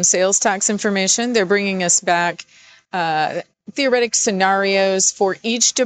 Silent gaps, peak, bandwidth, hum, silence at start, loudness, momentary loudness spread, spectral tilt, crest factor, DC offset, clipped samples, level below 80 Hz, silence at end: none; -4 dBFS; 14.5 kHz; none; 0 s; -17 LUFS; 8 LU; -2 dB/octave; 14 dB; under 0.1%; under 0.1%; -66 dBFS; 0 s